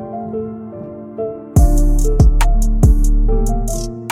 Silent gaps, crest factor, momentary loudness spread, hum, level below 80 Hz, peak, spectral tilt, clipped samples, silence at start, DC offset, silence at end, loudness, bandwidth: none; 12 dB; 15 LU; none; -14 dBFS; 0 dBFS; -6.5 dB/octave; under 0.1%; 0 s; under 0.1%; 0 s; -17 LUFS; 14.5 kHz